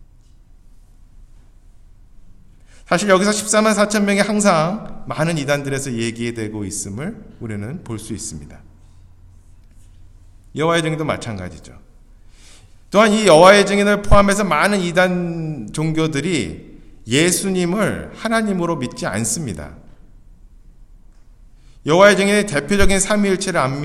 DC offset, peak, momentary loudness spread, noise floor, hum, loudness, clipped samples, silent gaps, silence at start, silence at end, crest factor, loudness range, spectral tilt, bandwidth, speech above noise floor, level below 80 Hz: under 0.1%; 0 dBFS; 17 LU; -46 dBFS; none; -17 LUFS; under 0.1%; none; 1.15 s; 0 s; 18 dB; 13 LU; -4.5 dB/octave; 15 kHz; 29 dB; -34 dBFS